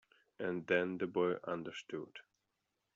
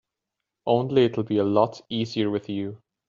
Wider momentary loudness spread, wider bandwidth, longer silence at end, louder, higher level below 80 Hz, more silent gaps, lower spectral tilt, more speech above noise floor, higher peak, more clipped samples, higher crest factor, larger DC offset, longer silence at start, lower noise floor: about the same, 12 LU vs 10 LU; about the same, 7.8 kHz vs 7.4 kHz; first, 0.75 s vs 0.3 s; second, -38 LUFS vs -24 LUFS; second, -82 dBFS vs -66 dBFS; neither; second, -4 dB/octave vs -5.5 dB/octave; second, 48 dB vs 61 dB; second, -18 dBFS vs -6 dBFS; neither; about the same, 22 dB vs 18 dB; neither; second, 0.4 s vs 0.65 s; about the same, -86 dBFS vs -85 dBFS